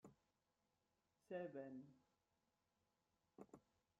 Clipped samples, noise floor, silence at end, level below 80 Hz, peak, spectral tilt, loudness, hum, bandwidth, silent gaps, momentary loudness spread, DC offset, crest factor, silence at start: under 0.1%; -89 dBFS; 0.4 s; under -90 dBFS; -40 dBFS; -6.5 dB/octave; -56 LUFS; none; 7 kHz; none; 15 LU; under 0.1%; 22 dB; 0.05 s